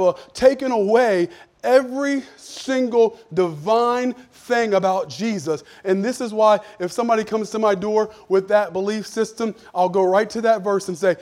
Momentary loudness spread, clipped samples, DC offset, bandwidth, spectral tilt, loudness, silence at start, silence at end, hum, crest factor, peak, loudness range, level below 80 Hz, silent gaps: 9 LU; under 0.1%; under 0.1%; 15 kHz; -5 dB/octave; -20 LUFS; 0 s; 0 s; none; 18 dB; -2 dBFS; 2 LU; -60 dBFS; none